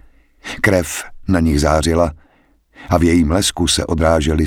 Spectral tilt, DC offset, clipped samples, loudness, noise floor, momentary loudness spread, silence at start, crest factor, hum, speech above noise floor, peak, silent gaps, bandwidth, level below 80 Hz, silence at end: -5 dB/octave; under 0.1%; under 0.1%; -16 LUFS; -55 dBFS; 9 LU; 0.45 s; 16 dB; none; 40 dB; 0 dBFS; none; 17.5 kHz; -26 dBFS; 0 s